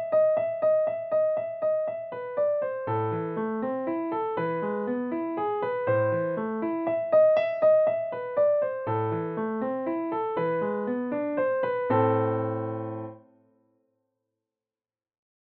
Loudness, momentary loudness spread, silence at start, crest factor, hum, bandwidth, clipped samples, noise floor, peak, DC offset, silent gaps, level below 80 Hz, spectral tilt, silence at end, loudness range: -27 LUFS; 8 LU; 0 s; 14 dB; none; 5 kHz; under 0.1%; under -90 dBFS; -12 dBFS; under 0.1%; none; -76 dBFS; -7 dB/octave; 2.25 s; 5 LU